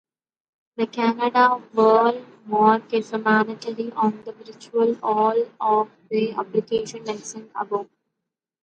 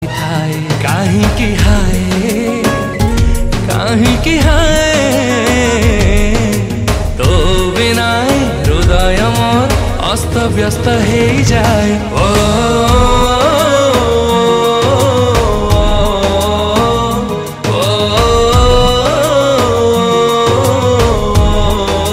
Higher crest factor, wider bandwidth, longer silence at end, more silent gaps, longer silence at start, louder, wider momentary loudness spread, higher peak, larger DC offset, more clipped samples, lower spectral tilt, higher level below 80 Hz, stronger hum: first, 20 dB vs 10 dB; second, 9 kHz vs 16 kHz; first, 0.8 s vs 0 s; neither; first, 0.8 s vs 0 s; second, -22 LUFS vs -11 LUFS; first, 14 LU vs 4 LU; second, -4 dBFS vs 0 dBFS; neither; neither; about the same, -5 dB/octave vs -5 dB/octave; second, -70 dBFS vs -18 dBFS; neither